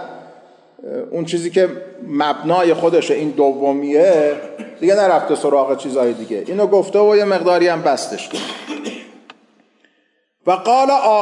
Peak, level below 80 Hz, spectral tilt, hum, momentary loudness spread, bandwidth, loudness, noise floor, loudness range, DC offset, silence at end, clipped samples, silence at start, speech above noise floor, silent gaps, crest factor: -4 dBFS; -76 dBFS; -5 dB/octave; none; 14 LU; 11.5 kHz; -16 LUFS; -63 dBFS; 5 LU; under 0.1%; 0 s; under 0.1%; 0 s; 48 dB; none; 14 dB